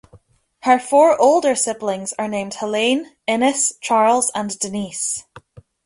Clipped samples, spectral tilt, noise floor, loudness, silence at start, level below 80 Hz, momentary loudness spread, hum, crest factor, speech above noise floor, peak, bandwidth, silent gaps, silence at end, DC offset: under 0.1%; -2.5 dB/octave; -51 dBFS; -18 LUFS; 0.15 s; -60 dBFS; 11 LU; none; 18 dB; 34 dB; -2 dBFS; 11.5 kHz; none; 0.45 s; under 0.1%